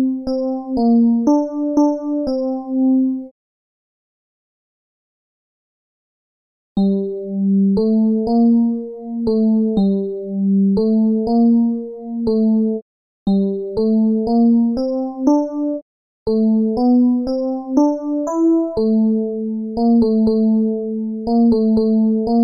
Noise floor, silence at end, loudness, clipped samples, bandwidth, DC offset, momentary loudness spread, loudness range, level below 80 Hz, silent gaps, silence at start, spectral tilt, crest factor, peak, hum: under -90 dBFS; 0 s; -17 LUFS; under 0.1%; 6.6 kHz; under 0.1%; 9 LU; 6 LU; -46 dBFS; 3.31-6.75 s, 12.82-13.26 s, 15.82-16.26 s; 0 s; -10 dB/octave; 14 dB; -2 dBFS; none